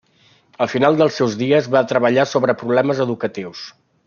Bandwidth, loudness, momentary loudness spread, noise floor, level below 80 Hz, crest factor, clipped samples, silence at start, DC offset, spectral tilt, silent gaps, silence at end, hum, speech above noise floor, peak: 7.2 kHz; -17 LUFS; 13 LU; -55 dBFS; -64 dBFS; 16 dB; under 0.1%; 0.6 s; under 0.1%; -6 dB/octave; none; 0.35 s; none; 38 dB; -2 dBFS